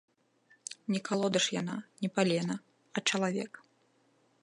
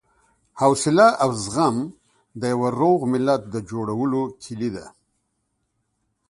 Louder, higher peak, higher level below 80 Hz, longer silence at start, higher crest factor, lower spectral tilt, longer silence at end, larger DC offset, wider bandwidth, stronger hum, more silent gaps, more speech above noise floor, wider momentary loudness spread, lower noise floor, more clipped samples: second, -32 LUFS vs -21 LUFS; second, -12 dBFS vs -2 dBFS; second, -82 dBFS vs -58 dBFS; first, 0.7 s vs 0.55 s; about the same, 22 dB vs 20 dB; second, -4 dB/octave vs -5.5 dB/octave; second, 0.85 s vs 1.4 s; neither; about the same, 11.5 kHz vs 11.5 kHz; neither; neither; second, 38 dB vs 53 dB; about the same, 13 LU vs 13 LU; about the same, -70 dBFS vs -73 dBFS; neither